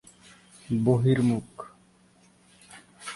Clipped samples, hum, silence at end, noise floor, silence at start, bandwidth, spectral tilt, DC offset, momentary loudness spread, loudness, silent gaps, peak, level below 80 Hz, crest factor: under 0.1%; none; 0 s; -60 dBFS; 0.7 s; 11.5 kHz; -7.5 dB/octave; under 0.1%; 22 LU; -25 LUFS; none; -8 dBFS; -60 dBFS; 20 dB